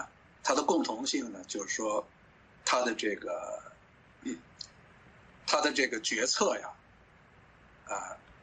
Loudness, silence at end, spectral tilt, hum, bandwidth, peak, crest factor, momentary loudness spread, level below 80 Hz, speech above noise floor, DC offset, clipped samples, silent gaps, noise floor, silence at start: -32 LUFS; 0.1 s; -1.5 dB/octave; none; 9.4 kHz; -12 dBFS; 22 dB; 17 LU; -68 dBFS; 28 dB; under 0.1%; under 0.1%; none; -60 dBFS; 0 s